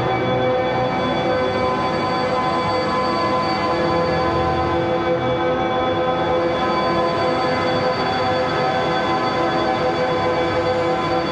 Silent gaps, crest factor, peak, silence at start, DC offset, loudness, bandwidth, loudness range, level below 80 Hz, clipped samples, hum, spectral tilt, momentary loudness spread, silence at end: none; 12 dB; -8 dBFS; 0 s; under 0.1%; -19 LUFS; 9.6 kHz; 0 LU; -42 dBFS; under 0.1%; none; -6 dB/octave; 1 LU; 0 s